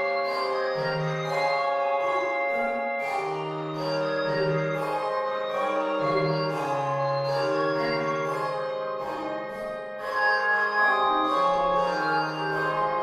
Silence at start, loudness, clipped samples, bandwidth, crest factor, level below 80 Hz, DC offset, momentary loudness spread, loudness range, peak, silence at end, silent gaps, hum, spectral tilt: 0 s; -26 LUFS; under 0.1%; 13.5 kHz; 16 dB; -62 dBFS; under 0.1%; 8 LU; 3 LU; -12 dBFS; 0 s; none; none; -5.5 dB/octave